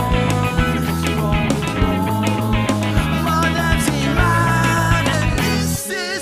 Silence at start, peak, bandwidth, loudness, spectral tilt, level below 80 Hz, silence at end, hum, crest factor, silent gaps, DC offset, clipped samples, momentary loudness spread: 0 s; -2 dBFS; 16 kHz; -18 LUFS; -5 dB/octave; -26 dBFS; 0 s; none; 16 dB; none; under 0.1%; under 0.1%; 4 LU